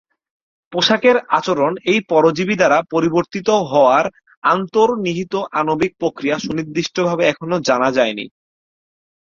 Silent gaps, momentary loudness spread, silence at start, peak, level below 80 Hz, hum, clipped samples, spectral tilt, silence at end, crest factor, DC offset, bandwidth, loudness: 4.37-4.42 s; 8 LU; 0.7 s; -2 dBFS; -56 dBFS; none; under 0.1%; -5 dB/octave; 0.95 s; 16 dB; under 0.1%; 7.6 kHz; -17 LUFS